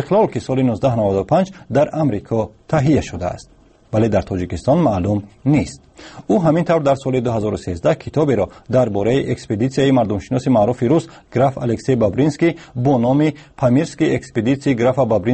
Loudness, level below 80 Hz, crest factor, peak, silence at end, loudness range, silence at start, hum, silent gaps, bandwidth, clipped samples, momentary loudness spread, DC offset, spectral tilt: -18 LUFS; -44 dBFS; 14 dB; -4 dBFS; 0 s; 2 LU; 0 s; none; none; 8.8 kHz; under 0.1%; 6 LU; under 0.1%; -7.5 dB/octave